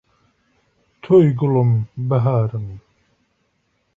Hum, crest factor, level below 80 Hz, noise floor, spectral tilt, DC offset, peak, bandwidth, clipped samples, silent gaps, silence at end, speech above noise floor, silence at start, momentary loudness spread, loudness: none; 16 dB; -52 dBFS; -67 dBFS; -11 dB/octave; under 0.1%; -4 dBFS; 3.7 kHz; under 0.1%; none; 1.15 s; 51 dB; 1.05 s; 12 LU; -17 LUFS